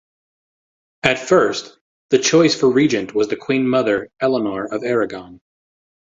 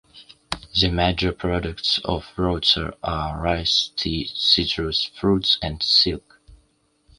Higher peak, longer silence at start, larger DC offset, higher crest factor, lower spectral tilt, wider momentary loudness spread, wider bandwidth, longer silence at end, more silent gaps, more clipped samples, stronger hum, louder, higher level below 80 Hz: about the same, 0 dBFS vs -2 dBFS; first, 1.05 s vs 0.15 s; neither; about the same, 18 dB vs 20 dB; about the same, -4.5 dB/octave vs -4.5 dB/octave; about the same, 9 LU vs 9 LU; second, 7.8 kHz vs 11.5 kHz; about the same, 0.75 s vs 0.65 s; first, 1.81-2.09 s vs none; neither; neither; about the same, -18 LUFS vs -20 LUFS; second, -56 dBFS vs -38 dBFS